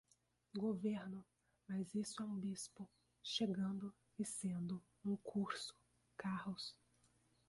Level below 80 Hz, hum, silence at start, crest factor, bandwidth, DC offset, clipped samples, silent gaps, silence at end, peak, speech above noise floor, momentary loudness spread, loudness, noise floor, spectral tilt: -80 dBFS; 60 Hz at -75 dBFS; 0.55 s; 18 dB; 11.5 kHz; under 0.1%; under 0.1%; none; 0.75 s; -28 dBFS; 35 dB; 11 LU; -45 LUFS; -79 dBFS; -5 dB/octave